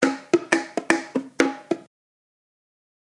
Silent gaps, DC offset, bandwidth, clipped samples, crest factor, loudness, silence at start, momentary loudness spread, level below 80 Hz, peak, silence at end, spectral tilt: none; under 0.1%; 11.5 kHz; under 0.1%; 26 dB; -24 LUFS; 0 s; 9 LU; -72 dBFS; 0 dBFS; 1.35 s; -3.5 dB/octave